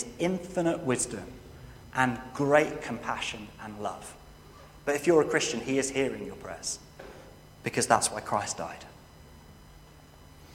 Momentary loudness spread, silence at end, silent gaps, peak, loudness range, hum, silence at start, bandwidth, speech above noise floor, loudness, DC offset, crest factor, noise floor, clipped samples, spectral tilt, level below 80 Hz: 23 LU; 0 s; none; -6 dBFS; 3 LU; none; 0 s; 16.5 kHz; 23 dB; -29 LUFS; under 0.1%; 26 dB; -52 dBFS; under 0.1%; -4 dB/octave; -56 dBFS